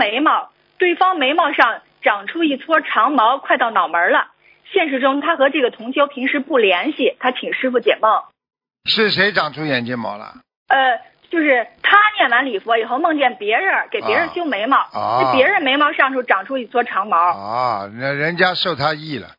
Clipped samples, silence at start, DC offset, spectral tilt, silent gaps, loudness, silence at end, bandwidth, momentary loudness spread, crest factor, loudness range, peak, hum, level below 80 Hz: under 0.1%; 0 s; under 0.1%; -6.5 dB/octave; 10.56-10.66 s; -16 LUFS; 0.15 s; 6 kHz; 7 LU; 18 dB; 2 LU; 0 dBFS; none; -66 dBFS